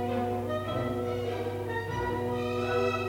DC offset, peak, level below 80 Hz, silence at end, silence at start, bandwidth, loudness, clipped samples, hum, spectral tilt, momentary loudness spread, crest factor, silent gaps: under 0.1%; -16 dBFS; -52 dBFS; 0 s; 0 s; 18.5 kHz; -31 LUFS; under 0.1%; 50 Hz at -40 dBFS; -6.5 dB/octave; 4 LU; 14 dB; none